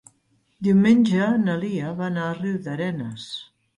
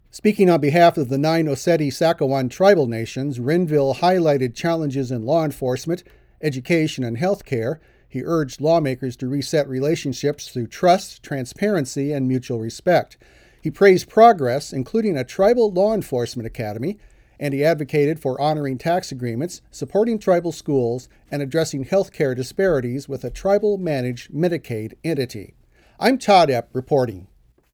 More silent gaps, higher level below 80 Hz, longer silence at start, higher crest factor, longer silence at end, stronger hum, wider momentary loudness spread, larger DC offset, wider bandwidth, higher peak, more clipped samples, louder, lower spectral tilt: neither; second, -62 dBFS vs -52 dBFS; first, 0.6 s vs 0.15 s; about the same, 16 dB vs 18 dB; second, 0.35 s vs 0.5 s; neither; about the same, 15 LU vs 13 LU; neither; second, 11 kHz vs over 20 kHz; second, -6 dBFS vs -2 dBFS; neither; about the same, -22 LUFS vs -20 LUFS; first, -7.5 dB/octave vs -6 dB/octave